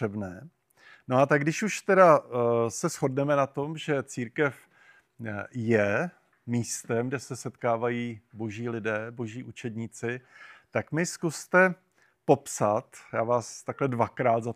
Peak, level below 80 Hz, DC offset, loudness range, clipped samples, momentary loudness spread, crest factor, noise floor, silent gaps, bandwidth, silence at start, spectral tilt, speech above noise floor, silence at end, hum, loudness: -6 dBFS; -74 dBFS; under 0.1%; 8 LU; under 0.1%; 15 LU; 22 dB; -60 dBFS; none; 15.5 kHz; 0 s; -5.5 dB/octave; 33 dB; 0 s; none; -28 LUFS